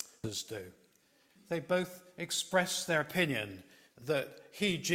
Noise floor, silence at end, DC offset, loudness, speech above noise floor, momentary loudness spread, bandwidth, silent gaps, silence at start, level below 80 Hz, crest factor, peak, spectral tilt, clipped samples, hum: -69 dBFS; 0 s; under 0.1%; -34 LUFS; 34 dB; 14 LU; 16.5 kHz; none; 0 s; -70 dBFS; 22 dB; -14 dBFS; -3.5 dB/octave; under 0.1%; none